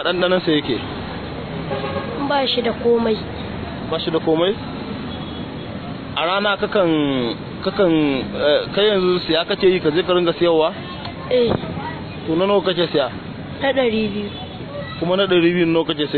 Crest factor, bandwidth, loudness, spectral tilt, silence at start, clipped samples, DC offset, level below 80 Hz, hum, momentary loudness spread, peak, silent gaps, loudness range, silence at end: 16 dB; 4.6 kHz; -19 LUFS; -8.5 dB/octave; 0 s; under 0.1%; under 0.1%; -44 dBFS; none; 12 LU; -4 dBFS; none; 4 LU; 0 s